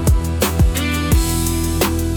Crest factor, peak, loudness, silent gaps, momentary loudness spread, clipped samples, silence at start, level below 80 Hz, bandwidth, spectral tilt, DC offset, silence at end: 12 dB; -4 dBFS; -17 LUFS; none; 2 LU; under 0.1%; 0 s; -20 dBFS; over 20 kHz; -5 dB/octave; under 0.1%; 0 s